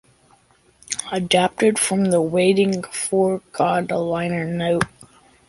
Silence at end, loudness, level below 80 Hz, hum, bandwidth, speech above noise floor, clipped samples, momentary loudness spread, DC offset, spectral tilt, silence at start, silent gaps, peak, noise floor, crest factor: 0.45 s; -20 LUFS; -54 dBFS; none; 11.5 kHz; 37 dB; under 0.1%; 7 LU; under 0.1%; -4.5 dB/octave; 0.9 s; none; -2 dBFS; -57 dBFS; 20 dB